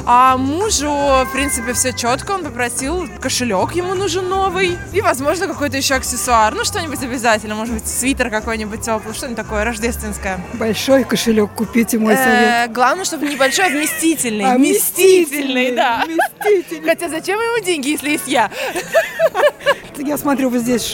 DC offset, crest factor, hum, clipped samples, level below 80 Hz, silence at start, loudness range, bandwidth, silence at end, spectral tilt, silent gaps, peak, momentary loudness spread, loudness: under 0.1%; 16 dB; none; under 0.1%; -38 dBFS; 0 s; 5 LU; 17 kHz; 0 s; -3 dB/octave; none; 0 dBFS; 8 LU; -16 LUFS